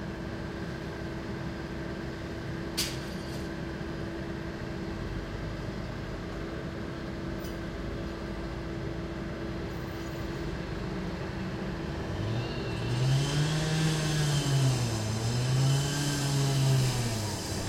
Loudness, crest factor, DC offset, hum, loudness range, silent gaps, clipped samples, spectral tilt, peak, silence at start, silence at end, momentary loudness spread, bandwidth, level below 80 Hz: -32 LUFS; 16 dB; under 0.1%; none; 9 LU; none; under 0.1%; -5 dB/octave; -16 dBFS; 0 s; 0 s; 10 LU; 16.5 kHz; -44 dBFS